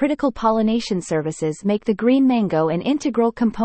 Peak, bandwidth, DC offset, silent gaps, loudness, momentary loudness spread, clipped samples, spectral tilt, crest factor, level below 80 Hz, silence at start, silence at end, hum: -6 dBFS; 8.8 kHz; under 0.1%; none; -20 LUFS; 6 LU; under 0.1%; -6.5 dB/octave; 14 dB; -50 dBFS; 0 s; 0 s; none